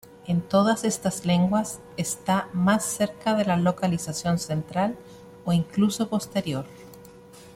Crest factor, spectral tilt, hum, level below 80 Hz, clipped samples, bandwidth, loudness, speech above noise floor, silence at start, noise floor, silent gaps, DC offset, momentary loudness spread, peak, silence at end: 16 dB; -5.5 dB/octave; none; -58 dBFS; under 0.1%; 16 kHz; -25 LUFS; 23 dB; 0.25 s; -47 dBFS; none; under 0.1%; 9 LU; -8 dBFS; 0.05 s